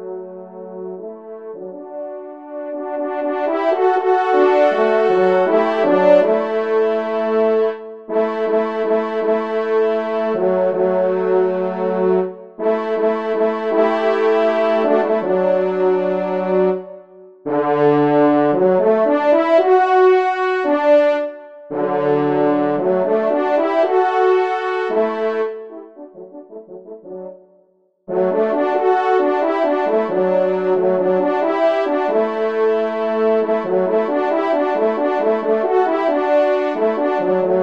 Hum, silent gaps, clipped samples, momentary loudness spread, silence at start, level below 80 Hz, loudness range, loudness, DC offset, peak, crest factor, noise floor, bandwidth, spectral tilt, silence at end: none; none; under 0.1%; 17 LU; 0 s; -70 dBFS; 6 LU; -17 LUFS; 0.3%; -2 dBFS; 16 dB; -58 dBFS; 6.4 kHz; -7.5 dB/octave; 0 s